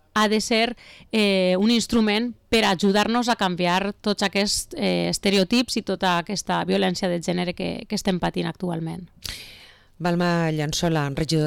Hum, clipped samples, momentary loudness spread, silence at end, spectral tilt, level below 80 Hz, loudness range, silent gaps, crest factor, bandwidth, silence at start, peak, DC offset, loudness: none; under 0.1%; 9 LU; 0 s; -4.5 dB/octave; -48 dBFS; 6 LU; none; 10 dB; 18.5 kHz; 0.15 s; -12 dBFS; under 0.1%; -22 LUFS